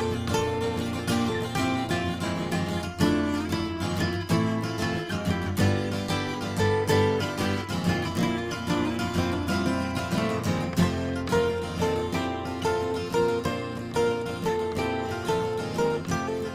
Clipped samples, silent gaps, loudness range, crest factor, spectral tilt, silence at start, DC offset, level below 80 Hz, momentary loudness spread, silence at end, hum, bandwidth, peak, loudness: under 0.1%; none; 2 LU; 16 dB; -5.5 dB/octave; 0 s; under 0.1%; -48 dBFS; 4 LU; 0 s; none; 16 kHz; -10 dBFS; -27 LUFS